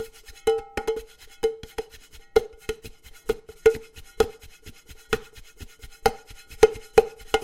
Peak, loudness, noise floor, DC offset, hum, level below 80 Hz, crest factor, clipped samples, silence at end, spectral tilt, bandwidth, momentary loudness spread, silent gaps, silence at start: 0 dBFS; -26 LUFS; -48 dBFS; under 0.1%; none; -46 dBFS; 26 dB; under 0.1%; 0 s; -3.5 dB/octave; 16.5 kHz; 24 LU; none; 0 s